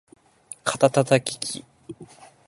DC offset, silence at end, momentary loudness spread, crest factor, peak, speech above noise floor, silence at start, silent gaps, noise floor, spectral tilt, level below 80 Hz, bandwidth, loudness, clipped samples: under 0.1%; 0.45 s; 23 LU; 24 dB; -2 dBFS; 26 dB; 0.65 s; none; -47 dBFS; -4.5 dB/octave; -66 dBFS; 12 kHz; -23 LUFS; under 0.1%